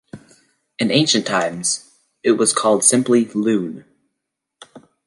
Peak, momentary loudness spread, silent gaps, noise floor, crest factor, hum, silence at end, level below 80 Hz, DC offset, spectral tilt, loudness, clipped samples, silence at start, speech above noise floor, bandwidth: 0 dBFS; 10 LU; none; -79 dBFS; 20 dB; none; 0.3 s; -66 dBFS; under 0.1%; -3 dB/octave; -17 LUFS; under 0.1%; 0.15 s; 62 dB; 11.5 kHz